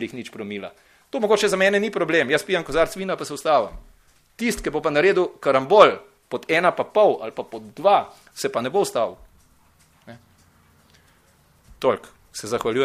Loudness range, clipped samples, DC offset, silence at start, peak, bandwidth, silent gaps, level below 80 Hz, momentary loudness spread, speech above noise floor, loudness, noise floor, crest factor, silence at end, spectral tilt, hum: 11 LU; under 0.1%; under 0.1%; 0 s; 0 dBFS; 15.5 kHz; none; -50 dBFS; 15 LU; 37 dB; -21 LUFS; -58 dBFS; 22 dB; 0 s; -4 dB/octave; none